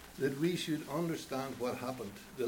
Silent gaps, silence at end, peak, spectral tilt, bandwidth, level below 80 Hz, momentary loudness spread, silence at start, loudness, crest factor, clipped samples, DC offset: none; 0 s; -20 dBFS; -5.5 dB/octave; over 20 kHz; -66 dBFS; 8 LU; 0 s; -37 LUFS; 16 dB; under 0.1%; under 0.1%